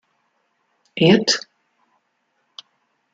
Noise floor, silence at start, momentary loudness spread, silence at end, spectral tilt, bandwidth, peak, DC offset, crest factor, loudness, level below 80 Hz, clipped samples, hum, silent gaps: -70 dBFS; 0.95 s; 28 LU; 1.75 s; -4.5 dB/octave; 9.2 kHz; -2 dBFS; under 0.1%; 22 dB; -17 LUFS; -64 dBFS; under 0.1%; none; none